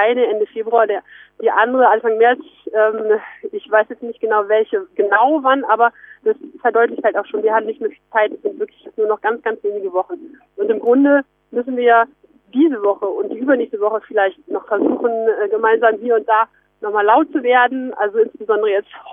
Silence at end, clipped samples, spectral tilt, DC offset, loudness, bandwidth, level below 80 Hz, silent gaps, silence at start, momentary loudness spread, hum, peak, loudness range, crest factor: 0 s; under 0.1%; -7.5 dB/octave; under 0.1%; -17 LUFS; 3.7 kHz; -68 dBFS; none; 0 s; 11 LU; none; 0 dBFS; 3 LU; 16 dB